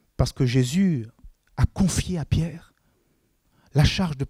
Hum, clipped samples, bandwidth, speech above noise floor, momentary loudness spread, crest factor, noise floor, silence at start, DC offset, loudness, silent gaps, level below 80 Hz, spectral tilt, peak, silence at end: none; under 0.1%; 15.5 kHz; 45 dB; 12 LU; 18 dB; -67 dBFS; 0.2 s; under 0.1%; -24 LUFS; none; -36 dBFS; -6 dB/octave; -6 dBFS; 0 s